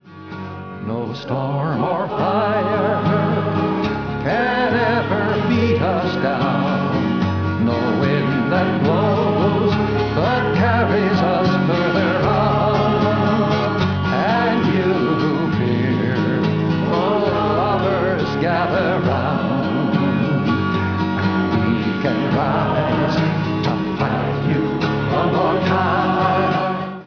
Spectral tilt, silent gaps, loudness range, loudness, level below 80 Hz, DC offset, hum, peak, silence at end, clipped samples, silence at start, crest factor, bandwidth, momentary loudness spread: -8 dB/octave; none; 2 LU; -18 LUFS; -44 dBFS; 0.3%; none; -4 dBFS; 0 s; under 0.1%; 0.05 s; 14 dB; 5.4 kHz; 4 LU